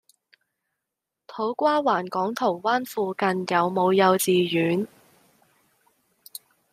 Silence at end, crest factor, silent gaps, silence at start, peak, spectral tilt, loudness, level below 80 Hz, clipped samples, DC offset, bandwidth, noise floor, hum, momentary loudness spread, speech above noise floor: 1.85 s; 20 dB; none; 1.3 s; -6 dBFS; -5 dB/octave; -23 LUFS; -74 dBFS; under 0.1%; under 0.1%; 15.5 kHz; -85 dBFS; none; 21 LU; 62 dB